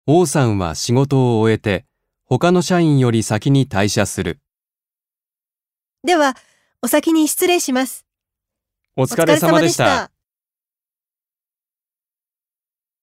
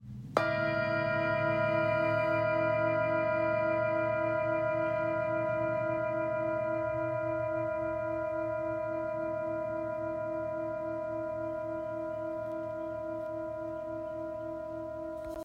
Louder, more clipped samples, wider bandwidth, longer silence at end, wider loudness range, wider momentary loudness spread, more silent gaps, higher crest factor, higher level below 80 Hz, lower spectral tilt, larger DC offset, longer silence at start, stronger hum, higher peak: first, -16 LUFS vs -33 LUFS; neither; first, 16 kHz vs 7 kHz; first, 2.95 s vs 0 s; second, 5 LU vs 8 LU; about the same, 11 LU vs 9 LU; neither; about the same, 18 dB vs 22 dB; first, -50 dBFS vs -62 dBFS; second, -5 dB/octave vs -8 dB/octave; neither; about the same, 0.05 s vs 0 s; neither; first, 0 dBFS vs -10 dBFS